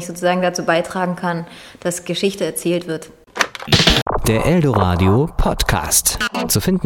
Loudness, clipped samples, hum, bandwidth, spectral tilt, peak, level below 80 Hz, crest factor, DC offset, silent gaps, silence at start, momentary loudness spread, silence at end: -17 LUFS; under 0.1%; none; 17.5 kHz; -4 dB/octave; 0 dBFS; -30 dBFS; 18 dB; under 0.1%; 4.02-4.06 s; 0 s; 10 LU; 0 s